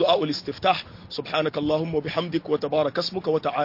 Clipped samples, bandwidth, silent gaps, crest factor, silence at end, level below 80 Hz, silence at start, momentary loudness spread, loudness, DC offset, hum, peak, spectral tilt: under 0.1%; 5.8 kHz; none; 16 dB; 0 s; -58 dBFS; 0 s; 4 LU; -25 LUFS; under 0.1%; none; -8 dBFS; -6 dB/octave